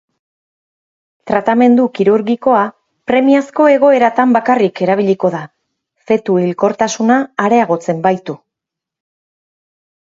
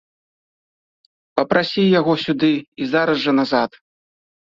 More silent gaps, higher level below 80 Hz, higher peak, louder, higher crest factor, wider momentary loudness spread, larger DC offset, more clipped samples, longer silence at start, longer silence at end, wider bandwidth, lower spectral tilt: second, none vs 2.68-2.72 s; about the same, -58 dBFS vs -60 dBFS; about the same, 0 dBFS vs 0 dBFS; first, -13 LUFS vs -18 LUFS; second, 14 dB vs 20 dB; about the same, 8 LU vs 7 LU; neither; neither; about the same, 1.25 s vs 1.35 s; first, 1.8 s vs 0.9 s; about the same, 7.8 kHz vs 7.4 kHz; about the same, -6 dB/octave vs -7 dB/octave